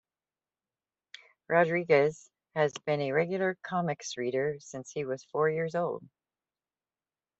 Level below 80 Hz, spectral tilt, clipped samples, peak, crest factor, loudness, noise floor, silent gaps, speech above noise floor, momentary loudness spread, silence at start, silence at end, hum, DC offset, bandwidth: -76 dBFS; -5.5 dB/octave; under 0.1%; -10 dBFS; 22 dB; -30 LUFS; under -90 dBFS; none; over 60 dB; 11 LU; 1.5 s; 1.35 s; none; under 0.1%; 8.2 kHz